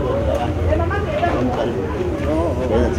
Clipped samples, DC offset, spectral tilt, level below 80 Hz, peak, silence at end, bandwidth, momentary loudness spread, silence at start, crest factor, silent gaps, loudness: under 0.1%; under 0.1%; -7.5 dB/octave; -30 dBFS; -4 dBFS; 0 s; 12 kHz; 3 LU; 0 s; 14 dB; none; -20 LUFS